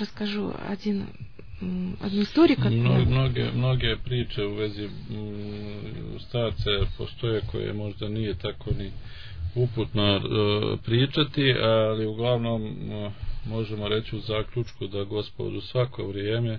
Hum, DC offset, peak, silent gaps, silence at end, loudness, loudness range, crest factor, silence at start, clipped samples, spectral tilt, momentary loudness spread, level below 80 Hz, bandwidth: none; 0.8%; -8 dBFS; none; 0 s; -27 LUFS; 6 LU; 20 dB; 0 s; under 0.1%; -8.5 dB/octave; 14 LU; -40 dBFS; 5.4 kHz